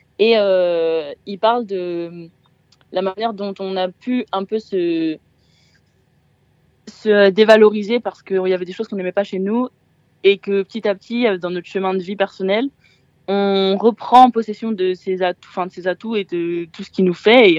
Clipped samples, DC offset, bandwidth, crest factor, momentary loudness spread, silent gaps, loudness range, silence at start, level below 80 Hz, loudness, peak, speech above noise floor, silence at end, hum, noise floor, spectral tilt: under 0.1%; under 0.1%; 8.2 kHz; 18 dB; 14 LU; none; 7 LU; 0.2 s; -68 dBFS; -18 LUFS; 0 dBFS; 42 dB; 0 s; none; -58 dBFS; -6.5 dB/octave